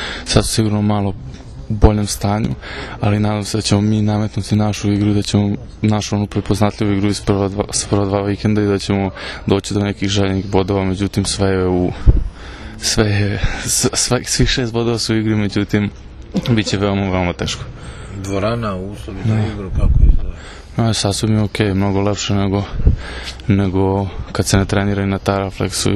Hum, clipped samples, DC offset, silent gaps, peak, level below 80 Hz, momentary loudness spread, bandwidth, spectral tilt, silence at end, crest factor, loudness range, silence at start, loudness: none; under 0.1%; under 0.1%; none; 0 dBFS; -24 dBFS; 9 LU; 13.5 kHz; -5 dB/octave; 0 s; 16 dB; 3 LU; 0 s; -17 LUFS